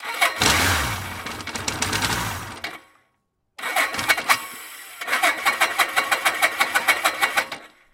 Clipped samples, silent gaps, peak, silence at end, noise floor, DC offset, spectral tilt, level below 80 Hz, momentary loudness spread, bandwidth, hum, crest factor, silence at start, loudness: under 0.1%; none; -2 dBFS; 0.25 s; -71 dBFS; under 0.1%; -1.5 dB/octave; -44 dBFS; 14 LU; 17 kHz; none; 22 dB; 0 s; -21 LUFS